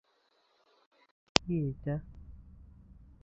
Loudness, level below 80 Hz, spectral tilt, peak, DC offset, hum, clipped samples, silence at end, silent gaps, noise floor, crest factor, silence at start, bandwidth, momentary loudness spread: -33 LUFS; -54 dBFS; -4 dB/octave; 0 dBFS; under 0.1%; none; under 0.1%; 0.3 s; none; -72 dBFS; 38 dB; 1.35 s; 7 kHz; 25 LU